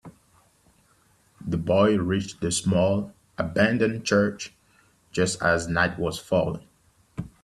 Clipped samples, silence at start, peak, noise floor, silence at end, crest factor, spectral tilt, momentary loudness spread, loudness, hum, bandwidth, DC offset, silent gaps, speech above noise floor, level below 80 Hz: under 0.1%; 0.05 s; -6 dBFS; -62 dBFS; 0.15 s; 20 dB; -5 dB/octave; 17 LU; -24 LUFS; none; 12.5 kHz; under 0.1%; none; 39 dB; -54 dBFS